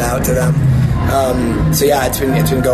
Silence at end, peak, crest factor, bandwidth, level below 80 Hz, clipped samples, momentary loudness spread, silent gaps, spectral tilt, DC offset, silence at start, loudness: 0 s; -2 dBFS; 10 dB; 14 kHz; -24 dBFS; under 0.1%; 2 LU; none; -6 dB/octave; under 0.1%; 0 s; -14 LUFS